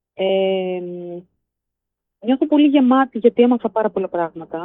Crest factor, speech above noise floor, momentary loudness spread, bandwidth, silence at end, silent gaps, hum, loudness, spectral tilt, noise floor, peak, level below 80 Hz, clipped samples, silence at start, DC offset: 18 dB; 64 dB; 15 LU; 3.9 kHz; 0 s; none; none; -17 LUFS; -9.5 dB/octave; -81 dBFS; -2 dBFS; -68 dBFS; under 0.1%; 0.2 s; under 0.1%